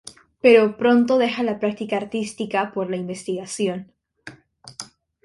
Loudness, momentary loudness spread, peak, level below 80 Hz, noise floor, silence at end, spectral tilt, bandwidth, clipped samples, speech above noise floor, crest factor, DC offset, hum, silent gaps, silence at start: -21 LUFS; 21 LU; -2 dBFS; -64 dBFS; -46 dBFS; 0.4 s; -5 dB/octave; 11.5 kHz; under 0.1%; 26 dB; 20 dB; under 0.1%; none; none; 0.05 s